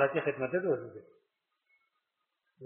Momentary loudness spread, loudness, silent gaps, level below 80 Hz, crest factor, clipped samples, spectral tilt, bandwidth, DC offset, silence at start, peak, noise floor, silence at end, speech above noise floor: 18 LU; -33 LUFS; none; -78 dBFS; 22 dB; under 0.1%; -5.5 dB/octave; 3.6 kHz; under 0.1%; 0 s; -14 dBFS; -84 dBFS; 0 s; 51 dB